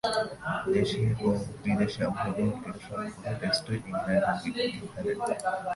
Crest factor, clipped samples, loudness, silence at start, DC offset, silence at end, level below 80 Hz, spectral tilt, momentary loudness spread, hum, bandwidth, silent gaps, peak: 16 dB; under 0.1%; -30 LUFS; 0.05 s; under 0.1%; 0 s; -54 dBFS; -6 dB/octave; 8 LU; none; 11.5 kHz; none; -12 dBFS